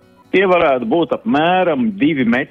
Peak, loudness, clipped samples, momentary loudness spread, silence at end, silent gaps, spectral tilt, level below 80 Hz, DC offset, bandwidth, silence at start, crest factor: -4 dBFS; -15 LUFS; under 0.1%; 4 LU; 0.05 s; none; -8 dB/octave; -52 dBFS; under 0.1%; 6.4 kHz; 0.35 s; 12 dB